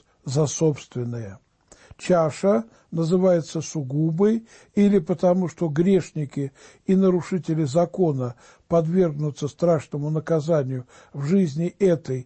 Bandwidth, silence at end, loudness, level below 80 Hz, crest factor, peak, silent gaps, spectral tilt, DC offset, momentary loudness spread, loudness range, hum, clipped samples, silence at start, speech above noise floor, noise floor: 8.8 kHz; 0.05 s; -23 LUFS; -58 dBFS; 14 dB; -10 dBFS; none; -7.5 dB/octave; under 0.1%; 11 LU; 2 LU; none; under 0.1%; 0.25 s; 29 dB; -51 dBFS